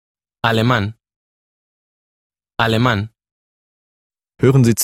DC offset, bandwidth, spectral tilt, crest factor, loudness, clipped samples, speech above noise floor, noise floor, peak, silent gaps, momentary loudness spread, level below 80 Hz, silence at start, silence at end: under 0.1%; 15.5 kHz; -5.5 dB/octave; 20 dB; -17 LUFS; under 0.1%; over 76 dB; under -90 dBFS; 0 dBFS; 1.16-2.30 s, 3.31-4.10 s; 14 LU; -48 dBFS; 0.45 s; 0 s